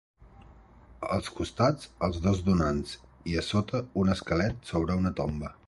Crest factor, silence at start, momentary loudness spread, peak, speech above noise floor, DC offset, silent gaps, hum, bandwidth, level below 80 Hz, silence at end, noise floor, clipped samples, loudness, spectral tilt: 18 dB; 0.2 s; 7 LU; -10 dBFS; 25 dB; under 0.1%; none; none; 11.5 kHz; -42 dBFS; 0.15 s; -54 dBFS; under 0.1%; -29 LUFS; -6.5 dB/octave